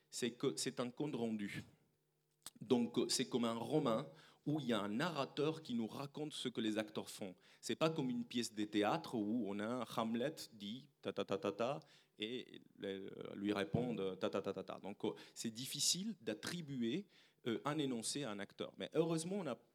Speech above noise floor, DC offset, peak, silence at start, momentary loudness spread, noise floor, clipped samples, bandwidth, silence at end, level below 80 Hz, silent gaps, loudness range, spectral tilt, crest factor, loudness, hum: 41 dB; under 0.1%; -20 dBFS; 0.1 s; 12 LU; -82 dBFS; under 0.1%; 17.5 kHz; 0.15 s; -82 dBFS; none; 4 LU; -4.5 dB/octave; 22 dB; -42 LUFS; none